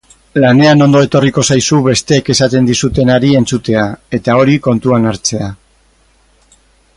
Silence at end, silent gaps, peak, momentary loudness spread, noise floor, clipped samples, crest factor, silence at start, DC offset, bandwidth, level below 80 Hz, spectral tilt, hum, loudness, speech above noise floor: 1.45 s; none; 0 dBFS; 9 LU; -51 dBFS; under 0.1%; 12 dB; 0.35 s; under 0.1%; 11.5 kHz; -38 dBFS; -5 dB/octave; none; -10 LUFS; 41 dB